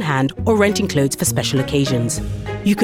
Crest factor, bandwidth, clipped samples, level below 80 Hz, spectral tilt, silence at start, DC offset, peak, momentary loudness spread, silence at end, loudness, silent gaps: 16 dB; 17.5 kHz; under 0.1%; -38 dBFS; -5 dB/octave; 0 s; under 0.1%; -2 dBFS; 6 LU; 0 s; -18 LUFS; none